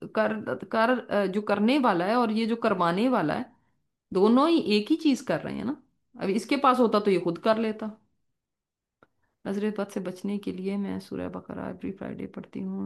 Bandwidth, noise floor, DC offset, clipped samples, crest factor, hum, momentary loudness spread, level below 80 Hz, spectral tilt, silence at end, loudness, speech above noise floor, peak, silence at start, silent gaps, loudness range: 12.5 kHz; -87 dBFS; under 0.1%; under 0.1%; 18 dB; none; 14 LU; -68 dBFS; -6.5 dB/octave; 0 s; -26 LUFS; 61 dB; -8 dBFS; 0 s; none; 9 LU